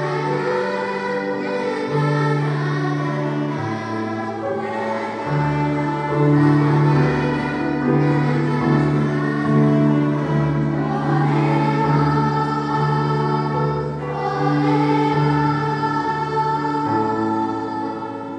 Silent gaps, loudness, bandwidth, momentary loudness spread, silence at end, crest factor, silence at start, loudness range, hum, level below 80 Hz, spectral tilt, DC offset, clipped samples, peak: none; -20 LUFS; 8.8 kHz; 8 LU; 0 s; 14 dB; 0 s; 4 LU; none; -48 dBFS; -8 dB/octave; under 0.1%; under 0.1%; -4 dBFS